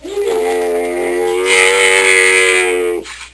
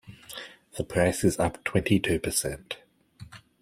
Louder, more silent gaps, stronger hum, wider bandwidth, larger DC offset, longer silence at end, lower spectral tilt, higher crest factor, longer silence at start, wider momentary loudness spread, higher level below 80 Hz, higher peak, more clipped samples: first, -11 LUFS vs -27 LUFS; neither; neither; second, 11 kHz vs 16 kHz; neither; second, 0.05 s vs 0.25 s; second, -0.5 dB/octave vs -4.5 dB/octave; second, 12 dB vs 22 dB; about the same, 0 s vs 0.05 s; second, 9 LU vs 18 LU; about the same, -46 dBFS vs -50 dBFS; first, 0 dBFS vs -8 dBFS; neither